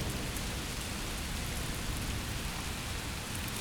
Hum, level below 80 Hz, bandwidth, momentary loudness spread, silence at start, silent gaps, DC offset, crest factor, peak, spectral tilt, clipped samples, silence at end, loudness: none; -42 dBFS; over 20 kHz; 1 LU; 0 s; none; under 0.1%; 20 dB; -16 dBFS; -3.5 dB/octave; under 0.1%; 0 s; -37 LUFS